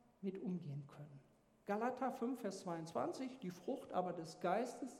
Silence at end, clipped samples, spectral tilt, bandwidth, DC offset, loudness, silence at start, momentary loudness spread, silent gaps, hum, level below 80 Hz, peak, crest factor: 0 s; under 0.1%; -6.5 dB/octave; 16 kHz; under 0.1%; -44 LUFS; 0.2 s; 14 LU; none; none; -86 dBFS; -24 dBFS; 20 dB